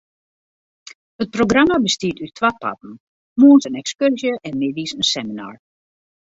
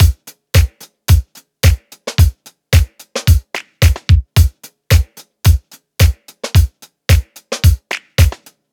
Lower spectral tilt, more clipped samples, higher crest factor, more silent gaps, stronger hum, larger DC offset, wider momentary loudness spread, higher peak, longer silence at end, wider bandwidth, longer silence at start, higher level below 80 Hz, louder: about the same, -4 dB/octave vs -5 dB/octave; neither; about the same, 18 dB vs 14 dB; first, 3.00-3.36 s vs none; neither; neither; first, 17 LU vs 11 LU; about the same, 0 dBFS vs 0 dBFS; first, 0.85 s vs 0.4 s; second, 8 kHz vs 19 kHz; first, 1.2 s vs 0 s; second, -54 dBFS vs -18 dBFS; about the same, -17 LUFS vs -15 LUFS